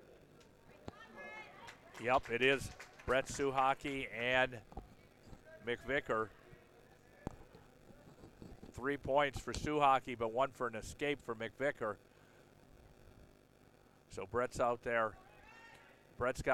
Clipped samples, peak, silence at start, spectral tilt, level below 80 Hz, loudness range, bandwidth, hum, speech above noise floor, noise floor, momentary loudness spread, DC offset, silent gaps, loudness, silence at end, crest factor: under 0.1%; -18 dBFS; 0.1 s; -4.5 dB/octave; -60 dBFS; 8 LU; 16.5 kHz; none; 29 dB; -66 dBFS; 22 LU; under 0.1%; none; -37 LUFS; 0 s; 22 dB